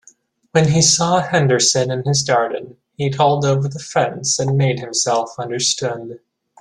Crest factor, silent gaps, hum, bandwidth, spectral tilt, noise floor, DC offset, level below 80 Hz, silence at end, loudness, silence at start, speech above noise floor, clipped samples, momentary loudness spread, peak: 16 dB; none; none; 11.5 kHz; -3.5 dB/octave; -52 dBFS; under 0.1%; -54 dBFS; 0.45 s; -17 LUFS; 0.55 s; 35 dB; under 0.1%; 11 LU; -2 dBFS